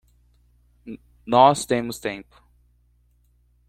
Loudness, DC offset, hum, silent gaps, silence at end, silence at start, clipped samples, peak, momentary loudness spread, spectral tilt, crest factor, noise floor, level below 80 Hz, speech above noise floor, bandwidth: -20 LUFS; under 0.1%; 60 Hz at -45 dBFS; none; 1.45 s; 0.85 s; under 0.1%; -2 dBFS; 25 LU; -4.5 dB/octave; 22 dB; -61 dBFS; -56 dBFS; 41 dB; 15.5 kHz